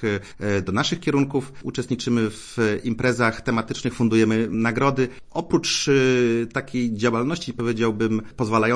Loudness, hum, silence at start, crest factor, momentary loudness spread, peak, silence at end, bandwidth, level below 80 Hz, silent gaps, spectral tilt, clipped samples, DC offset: -22 LUFS; none; 0 s; 18 dB; 8 LU; -4 dBFS; 0 s; 10.5 kHz; -50 dBFS; none; -5 dB/octave; under 0.1%; under 0.1%